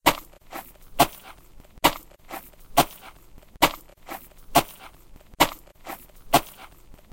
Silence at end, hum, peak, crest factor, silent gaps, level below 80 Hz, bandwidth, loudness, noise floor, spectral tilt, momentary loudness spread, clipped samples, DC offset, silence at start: 0.5 s; none; -2 dBFS; 26 dB; none; -46 dBFS; 17 kHz; -24 LUFS; -48 dBFS; -3 dB/octave; 19 LU; under 0.1%; under 0.1%; 0.05 s